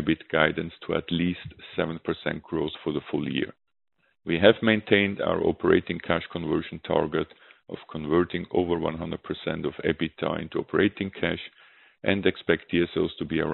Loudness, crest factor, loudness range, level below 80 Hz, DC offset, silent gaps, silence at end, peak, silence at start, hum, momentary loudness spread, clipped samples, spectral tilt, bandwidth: -26 LUFS; 26 dB; 5 LU; -54 dBFS; under 0.1%; none; 0 s; -2 dBFS; 0 s; none; 11 LU; under 0.1%; -4 dB/octave; 4.2 kHz